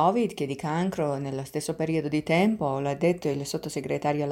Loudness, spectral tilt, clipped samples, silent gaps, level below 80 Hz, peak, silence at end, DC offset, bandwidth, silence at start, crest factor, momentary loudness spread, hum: -27 LUFS; -6 dB/octave; under 0.1%; none; -60 dBFS; -8 dBFS; 0 s; under 0.1%; 16.5 kHz; 0 s; 18 dB; 8 LU; none